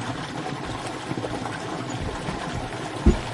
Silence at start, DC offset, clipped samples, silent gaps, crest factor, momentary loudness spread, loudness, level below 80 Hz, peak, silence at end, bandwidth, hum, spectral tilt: 0 s; under 0.1%; under 0.1%; none; 22 dB; 8 LU; -29 LUFS; -34 dBFS; -4 dBFS; 0 s; 11.5 kHz; none; -5.5 dB/octave